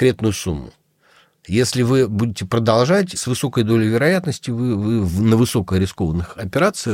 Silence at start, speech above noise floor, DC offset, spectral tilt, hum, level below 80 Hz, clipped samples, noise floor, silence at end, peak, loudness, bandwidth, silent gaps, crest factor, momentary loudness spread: 0 s; 37 dB; under 0.1%; -6 dB/octave; none; -42 dBFS; under 0.1%; -55 dBFS; 0 s; -2 dBFS; -18 LUFS; 16.5 kHz; none; 16 dB; 7 LU